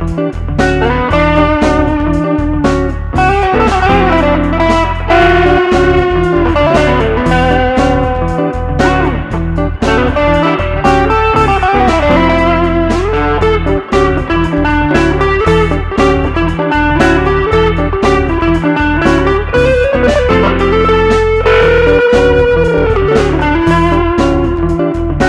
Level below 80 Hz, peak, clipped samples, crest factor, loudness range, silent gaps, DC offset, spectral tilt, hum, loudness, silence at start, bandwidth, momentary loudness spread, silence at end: -18 dBFS; 0 dBFS; 0.2%; 10 dB; 2 LU; none; under 0.1%; -7 dB/octave; none; -10 LUFS; 0 s; 11 kHz; 5 LU; 0 s